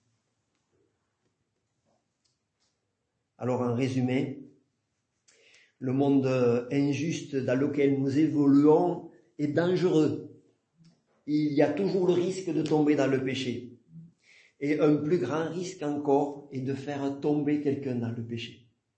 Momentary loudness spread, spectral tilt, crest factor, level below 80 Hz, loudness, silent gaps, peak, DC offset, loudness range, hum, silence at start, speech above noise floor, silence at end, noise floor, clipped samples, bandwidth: 12 LU; -7 dB/octave; 18 dB; -74 dBFS; -27 LUFS; none; -10 dBFS; under 0.1%; 8 LU; none; 3.4 s; 54 dB; 0.45 s; -80 dBFS; under 0.1%; 8.6 kHz